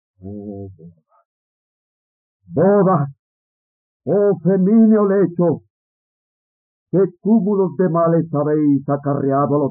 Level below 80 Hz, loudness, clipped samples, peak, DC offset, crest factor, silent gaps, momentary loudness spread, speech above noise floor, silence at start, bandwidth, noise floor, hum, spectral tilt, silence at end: -72 dBFS; -16 LUFS; under 0.1%; -4 dBFS; under 0.1%; 14 dB; 1.25-2.40 s, 3.19-4.00 s, 5.70-6.86 s; 18 LU; over 74 dB; 0.25 s; 2.3 kHz; under -90 dBFS; none; -14 dB/octave; 0 s